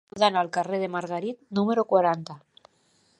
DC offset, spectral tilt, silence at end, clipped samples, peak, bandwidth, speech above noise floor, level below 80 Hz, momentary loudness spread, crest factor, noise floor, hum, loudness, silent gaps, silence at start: under 0.1%; -5.5 dB/octave; 0.8 s; under 0.1%; -6 dBFS; 11 kHz; 40 dB; -74 dBFS; 10 LU; 20 dB; -65 dBFS; none; -25 LUFS; none; 0.15 s